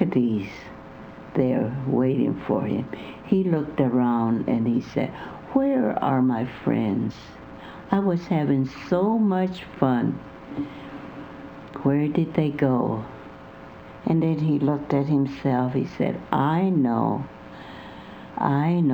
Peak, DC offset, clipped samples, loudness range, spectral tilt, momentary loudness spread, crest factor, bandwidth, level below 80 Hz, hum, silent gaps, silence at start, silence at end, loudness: -4 dBFS; under 0.1%; under 0.1%; 3 LU; -9.5 dB/octave; 19 LU; 20 dB; over 20 kHz; -54 dBFS; none; none; 0 s; 0 s; -24 LUFS